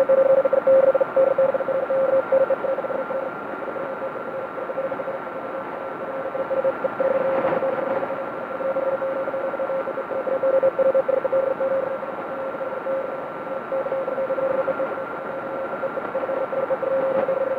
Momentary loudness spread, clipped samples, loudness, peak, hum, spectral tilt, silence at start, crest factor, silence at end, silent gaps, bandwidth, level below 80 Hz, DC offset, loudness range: 11 LU; under 0.1%; -23 LUFS; -8 dBFS; none; -7.5 dB/octave; 0 s; 14 dB; 0 s; none; 4.3 kHz; -66 dBFS; under 0.1%; 7 LU